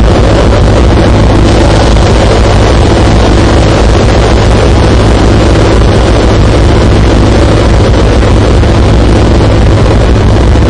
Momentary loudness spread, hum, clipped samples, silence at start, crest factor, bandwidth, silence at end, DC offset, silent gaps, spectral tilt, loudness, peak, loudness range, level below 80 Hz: 1 LU; none; 0.2%; 0 s; 4 dB; 10 kHz; 0 s; 0.7%; none; -6.5 dB/octave; -6 LUFS; 0 dBFS; 0 LU; -8 dBFS